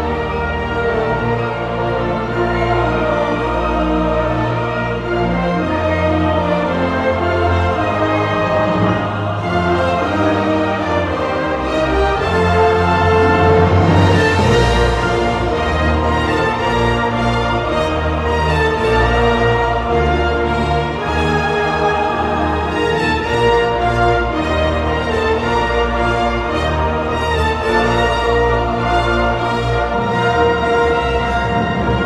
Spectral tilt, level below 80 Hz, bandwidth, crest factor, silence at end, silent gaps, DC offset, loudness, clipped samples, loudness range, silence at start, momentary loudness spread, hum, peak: -6.5 dB/octave; -26 dBFS; 12 kHz; 14 dB; 0 s; none; under 0.1%; -16 LUFS; under 0.1%; 4 LU; 0 s; 5 LU; none; -2 dBFS